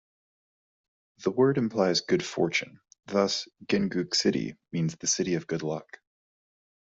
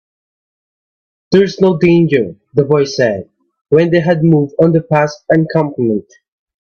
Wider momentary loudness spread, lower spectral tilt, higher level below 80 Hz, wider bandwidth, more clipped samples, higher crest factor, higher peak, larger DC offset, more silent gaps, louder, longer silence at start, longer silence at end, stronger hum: first, 9 LU vs 6 LU; second, -4 dB/octave vs -7.5 dB/octave; second, -68 dBFS vs -52 dBFS; first, 8 kHz vs 7 kHz; neither; about the same, 18 dB vs 14 dB; second, -10 dBFS vs 0 dBFS; neither; second, none vs 3.61-3.65 s; second, -28 LUFS vs -13 LUFS; about the same, 1.2 s vs 1.3 s; first, 1.1 s vs 0.6 s; neither